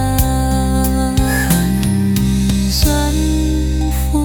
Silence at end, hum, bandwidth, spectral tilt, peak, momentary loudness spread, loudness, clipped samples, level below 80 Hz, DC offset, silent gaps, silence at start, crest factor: 0 s; none; 19 kHz; -5.5 dB/octave; 0 dBFS; 3 LU; -15 LUFS; under 0.1%; -18 dBFS; under 0.1%; none; 0 s; 14 dB